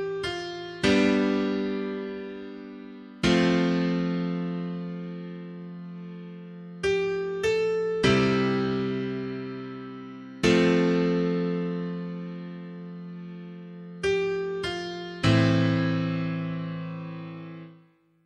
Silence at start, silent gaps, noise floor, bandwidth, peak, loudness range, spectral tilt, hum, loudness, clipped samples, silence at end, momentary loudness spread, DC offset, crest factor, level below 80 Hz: 0 s; none; -59 dBFS; 11 kHz; -6 dBFS; 6 LU; -6.5 dB/octave; none; -26 LUFS; under 0.1%; 0.5 s; 19 LU; under 0.1%; 20 dB; -54 dBFS